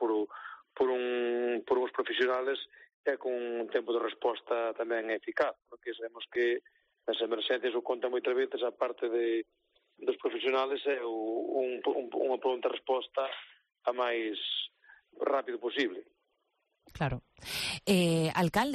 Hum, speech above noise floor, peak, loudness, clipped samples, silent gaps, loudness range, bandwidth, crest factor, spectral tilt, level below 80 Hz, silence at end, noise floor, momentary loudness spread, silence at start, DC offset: none; 47 dB; -16 dBFS; -33 LUFS; under 0.1%; 2.94-3.04 s; 2 LU; 13 kHz; 16 dB; -5 dB/octave; -64 dBFS; 0 s; -79 dBFS; 8 LU; 0 s; under 0.1%